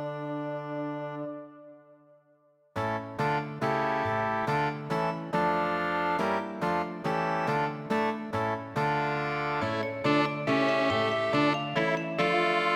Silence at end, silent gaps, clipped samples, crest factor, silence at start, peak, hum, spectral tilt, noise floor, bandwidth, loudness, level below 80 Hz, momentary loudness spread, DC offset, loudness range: 0 s; none; under 0.1%; 16 dB; 0 s; -12 dBFS; none; -6 dB/octave; -65 dBFS; 17 kHz; -29 LUFS; -64 dBFS; 9 LU; under 0.1%; 6 LU